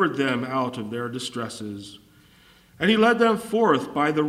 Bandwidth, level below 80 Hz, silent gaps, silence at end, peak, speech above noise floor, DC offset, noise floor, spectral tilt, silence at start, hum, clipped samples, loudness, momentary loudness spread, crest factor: 15 kHz; -62 dBFS; none; 0 s; -6 dBFS; 32 dB; under 0.1%; -54 dBFS; -5 dB/octave; 0 s; none; under 0.1%; -23 LUFS; 16 LU; 18 dB